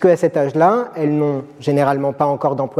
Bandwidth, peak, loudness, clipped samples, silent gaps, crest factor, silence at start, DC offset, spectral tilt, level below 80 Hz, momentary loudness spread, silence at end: 12.5 kHz; -4 dBFS; -17 LUFS; under 0.1%; none; 14 dB; 0 s; under 0.1%; -8 dB/octave; -64 dBFS; 5 LU; 0 s